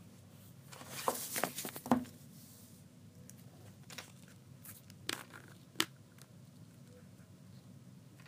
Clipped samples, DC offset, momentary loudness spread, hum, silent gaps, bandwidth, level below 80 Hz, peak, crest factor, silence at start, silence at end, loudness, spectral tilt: under 0.1%; under 0.1%; 21 LU; none; none; 15.5 kHz; -80 dBFS; -8 dBFS; 36 dB; 0 s; 0 s; -40 LUFS; -3 dB/octave